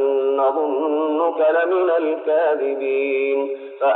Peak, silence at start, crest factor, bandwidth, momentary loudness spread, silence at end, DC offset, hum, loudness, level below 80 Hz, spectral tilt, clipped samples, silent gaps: -8 dBFS; 0 s; 10 dB; 4.1 kHz; 4 LU; 0 s; under 0.1%; none; -19 LUFS; -88 dBFS; 0 dB/octave; under 0.1%; none